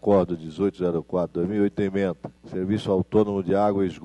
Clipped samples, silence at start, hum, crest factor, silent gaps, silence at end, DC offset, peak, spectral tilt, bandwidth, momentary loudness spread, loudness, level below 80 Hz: under 0.1%; 0.05 s; none; 16 dB; none; 0 s; under 0.1%; -8 dBFS; -8.5 dB/octave; 10.5 kHz; 7 LU; -24 LUFS; -56 dBFS